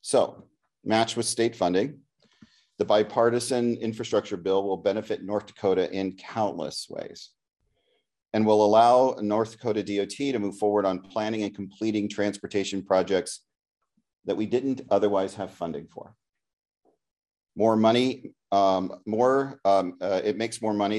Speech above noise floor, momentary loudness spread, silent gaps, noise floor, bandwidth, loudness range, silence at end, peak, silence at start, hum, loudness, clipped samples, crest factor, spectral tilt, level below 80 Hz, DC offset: 48 dB; 12 LU; none; -73 dBFS; 12.5 kHz; 6 LU; 0 s; -8 dBFS; 0.05 s; none; -26 LUFS; under 0.1%; 20 dB; -5 dB/octave; -72 dBFS; under 0.1%